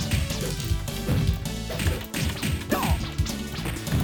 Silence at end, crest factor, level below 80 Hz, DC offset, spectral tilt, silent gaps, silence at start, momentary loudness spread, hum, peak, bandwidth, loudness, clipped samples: 0 s; 16 dB; -32 dBFS; under 0.1%; -5 dB/octave; none; 0 s; 5 LU; none; -10 dBFS; 19 kHz; -27 LUFS; under 0.1%